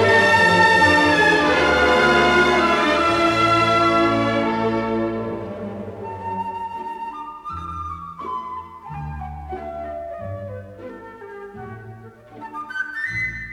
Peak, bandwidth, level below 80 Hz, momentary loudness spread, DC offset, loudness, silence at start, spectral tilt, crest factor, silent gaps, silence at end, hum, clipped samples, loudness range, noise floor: -4 dBFS; 14.5 kHz; -44 dBFS; 22 LU; under 0.1%; -17 LUFS; 0 s; -4.5 dB/octave; 16 dB; none; 0 s; none; under 0.1%; 18 LU; -41 dBFS